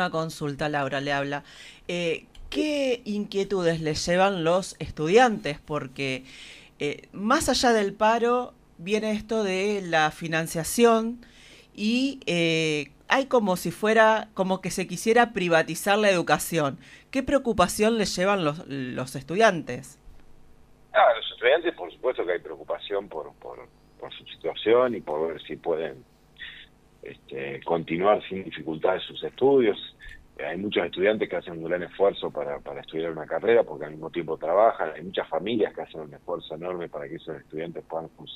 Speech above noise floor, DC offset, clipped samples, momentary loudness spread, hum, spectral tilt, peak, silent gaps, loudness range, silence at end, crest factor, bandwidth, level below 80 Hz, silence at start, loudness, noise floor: 27 dB; under 0.1%; under 0.1%; 15 LU; none; -4.5 dB/octave; -4 dBFS; none; 6 LU; 0 s; 22 dB; 15.5 kHz; -54 dBFS; 0 s; -25 LUFS; -52 dBFS